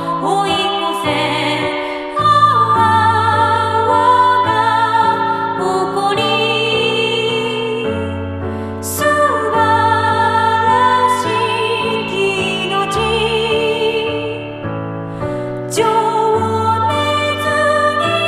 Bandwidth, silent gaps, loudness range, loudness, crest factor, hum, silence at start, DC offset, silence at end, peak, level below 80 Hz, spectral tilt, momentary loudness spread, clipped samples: 15.5 kHz; none; 5 LU; -15 LUFS; 14 dB; none; 0 s; under 0.1%; 0 s; 0 dBFS; -46 dBFS; -4.5 dB/octave; 10 LU; under 0.1%